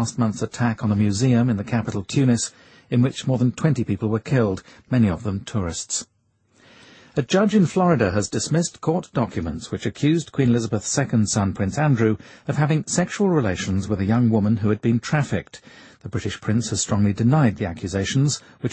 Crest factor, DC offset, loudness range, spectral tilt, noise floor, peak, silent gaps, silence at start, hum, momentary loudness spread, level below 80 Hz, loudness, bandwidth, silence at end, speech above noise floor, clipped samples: 16 dB; under 0.1%; 2 LU; -6 dB/octave; -62 dBFS; -4 dBFS; none; 0 s; none; 9 LU; -50 dBFS; -22 LUFS; 8.8 kHz; 0 s; 41 dB; under 0.1%